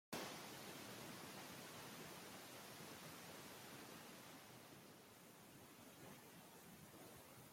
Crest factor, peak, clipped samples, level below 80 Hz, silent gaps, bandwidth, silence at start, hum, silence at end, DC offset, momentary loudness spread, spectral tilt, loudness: 24 dB; -34 dBFS; under 0.1%; -86 dBFS; none; 16.5 kHz; 0.1 s; none; 0 s; under 0.1%; 8 LU; -3 dB/octave; -57 LUFS